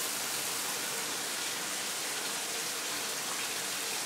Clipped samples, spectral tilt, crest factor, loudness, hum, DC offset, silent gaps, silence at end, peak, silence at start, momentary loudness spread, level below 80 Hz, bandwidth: under 0.1%; 0.5 dB/octave; 14 dB; -33 LUFS; none; under 0.1%; none; 0 s; -22 dBFS; 0 s; 1 LU; -80 dBFS; 16 kHz